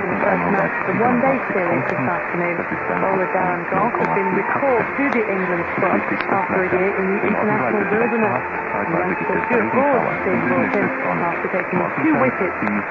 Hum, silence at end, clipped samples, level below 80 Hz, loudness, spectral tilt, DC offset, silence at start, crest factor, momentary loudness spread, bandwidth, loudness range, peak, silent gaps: none; 0 s; under 0.1%; -54 dBFS; -19 LUFS; -9 dB/octave; under 0.1%; 0 s; 14 dB; 4 LU; 7 kHz; 1 LU; -4 dBFS; none